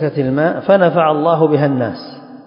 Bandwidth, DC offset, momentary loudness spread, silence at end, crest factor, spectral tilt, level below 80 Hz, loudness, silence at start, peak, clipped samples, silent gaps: 5.4 kHz; under 0.1%; 11 LU; 0.05 s; 14 dB; -11 dB/octave; -54 dBFS; -14 LUFS; 0 s; 0 dBFS; under 0.1%; none